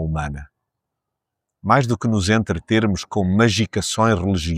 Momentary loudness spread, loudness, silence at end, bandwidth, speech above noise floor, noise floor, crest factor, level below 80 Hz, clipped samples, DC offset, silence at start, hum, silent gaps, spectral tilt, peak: 9 LU; -19 LUFS; 0 s; 14.5 kHz; 63 dB; -82 dBFS; 18 dB; -38 dBFS; under 0.1%; under 0.1%; 0 s; none; none; -5.5 dB/octave; -2 dBFS